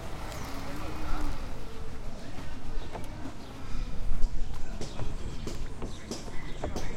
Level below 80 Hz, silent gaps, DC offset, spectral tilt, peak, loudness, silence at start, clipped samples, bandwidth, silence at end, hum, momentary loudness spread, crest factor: -34 dBFS; none; under 0.1%; -5 dB/octave; -8 dBFS; -40 LUFS; 0 s; under 0.1%; 9.8 kHz; 0 s; none; 6 LU; 18 dB